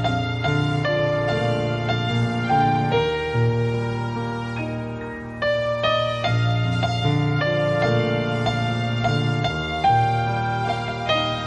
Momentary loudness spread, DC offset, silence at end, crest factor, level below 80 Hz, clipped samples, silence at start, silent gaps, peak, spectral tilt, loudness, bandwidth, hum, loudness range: 7 LU; under 0.1%; 0 s; 14 dB; -46 dBFS; under 0.1%; 0 s; none; -8 dBFS; -6.5 dB/octave; -22 LUFS; 8.8 kHz; none; 2 LU